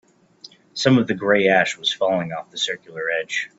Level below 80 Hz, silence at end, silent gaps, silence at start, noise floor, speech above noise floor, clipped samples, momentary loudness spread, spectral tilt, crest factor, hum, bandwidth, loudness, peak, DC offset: -64 dBFS; 0.1 s; none; 0.75 s; -48 dBFS; 27 dB; under 0.1%; 9 LU; -4.5 dB/octave; 20 dB; none; 8 kHz; -20 LUFS; -2 dBFS; under 0.1%